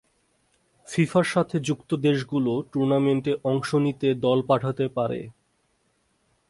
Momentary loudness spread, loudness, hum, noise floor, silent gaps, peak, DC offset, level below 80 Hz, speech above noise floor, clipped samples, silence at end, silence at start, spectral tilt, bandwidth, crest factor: 6 LU; -24 LUFS; none; -69 dBFS; none; -6 dBFS; under 0.1%; -62 dBFS; 46 dB; under 0.1%; 1.2 s; 0.9 s; -6.5 dB/octave; 11.5 kHz; 18 dB